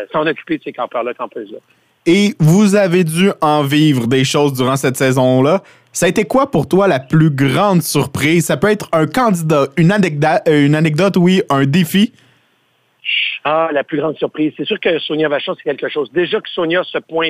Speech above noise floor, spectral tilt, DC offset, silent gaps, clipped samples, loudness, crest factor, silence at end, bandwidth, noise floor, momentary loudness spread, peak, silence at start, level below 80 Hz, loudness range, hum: 45 dB; -5.5 dB/octave; under 0.1%; none; under 0.1%; -14 LUFS; 12 dB; 0 s; 16 kHz; -59 dBFS; 9 LU; -2 dBFS; 0 s; -52 dBFS; 4 LU; none